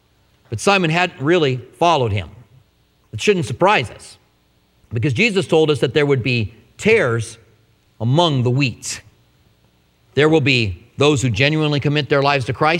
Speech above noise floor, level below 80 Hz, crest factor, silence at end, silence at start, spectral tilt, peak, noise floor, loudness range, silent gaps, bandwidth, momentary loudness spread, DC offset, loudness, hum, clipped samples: 42 dB; -50 dBFS; 18 dB; 0 s; 0.5 s; -5.5 dB/octave; 0 dBFS; -59 dBFS; 3 LU; none; 13 kHz; 11 LU; under 0.1%; -17 LUFS; none; under 0.1%